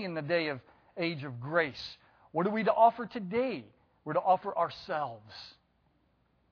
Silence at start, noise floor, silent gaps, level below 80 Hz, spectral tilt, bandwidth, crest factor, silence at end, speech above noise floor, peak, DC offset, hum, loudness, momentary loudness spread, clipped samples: 0 s; -71 dBFS; none; -72 dBFS; -7 dB/octave; 5.4 kHz; 22 dB; 1 s; 40 dB; -12 dBFS; under 0.1%; none; -31 LUFS; 20 LU; under 0.1%